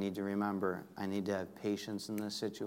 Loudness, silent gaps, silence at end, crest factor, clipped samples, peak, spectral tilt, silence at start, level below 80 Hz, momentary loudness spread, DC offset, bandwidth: -38 LUFS; none; 0 s; 18 dB; under 0.1%; -20 dBFS; -5.5 dB/octave; 0 s; -80 dBFS; 4 LU; under 0.1%; 16 kHz